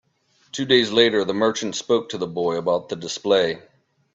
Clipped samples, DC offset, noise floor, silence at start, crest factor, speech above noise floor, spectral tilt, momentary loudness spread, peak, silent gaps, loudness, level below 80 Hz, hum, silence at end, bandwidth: under 0.1%; under 0.1%; -63 dBFS; 0.55 s; 20 dB; 42 dB; -3.5 dB/octave; 12 LU; -2 dBFS; none; -21 LUFS; -64 dBFS; none; 0.55 s; 8 kHz